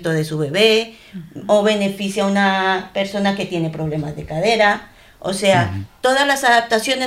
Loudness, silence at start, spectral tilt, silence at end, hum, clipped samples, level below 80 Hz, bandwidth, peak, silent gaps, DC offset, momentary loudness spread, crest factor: -17 LUFS; 0 s; -4.5 dB/octave; 0 s; none; under 0.1%; -50 dBFS; 16 kHz; -2 dBFS; none; under 0.1%; 11 LU; 16 dB